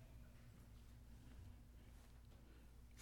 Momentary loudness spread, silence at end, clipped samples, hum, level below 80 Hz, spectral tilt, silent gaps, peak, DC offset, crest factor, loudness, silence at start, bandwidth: 3 LU; 0 s; under 0.1%; none; -64 dBFS; -5.5 dB/octave; none; -42 dBFS; under 0.1%; 20 dB; -64 LUFS; 0 s; 18 kHz